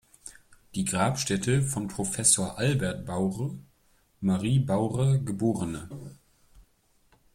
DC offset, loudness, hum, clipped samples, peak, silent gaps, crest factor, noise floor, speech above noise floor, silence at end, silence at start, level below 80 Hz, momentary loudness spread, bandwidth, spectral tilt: under 0.1%; -27 LUFS; none; under 0.1%; -8 dBFS; none; 22 dB; -65 dBFS; 38 dB; 0.75 s; 0.25 s; -56 dBFS; 20 LU; 15.5 kHz; -5 dB/octave